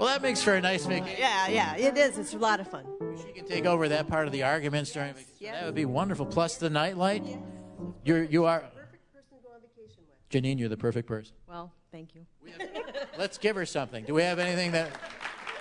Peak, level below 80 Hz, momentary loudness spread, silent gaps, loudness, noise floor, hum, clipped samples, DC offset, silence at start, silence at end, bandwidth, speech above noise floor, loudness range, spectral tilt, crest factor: -10 dBFS; -62 dBFS; 17 LU; none; -29 LUFS; -59 dBFS; none; under 0.1%; under 0.1%; 0 s; 0 s; 11 kHz; 30 dB; 8 LU; -4.5 dB/octave; 20 dB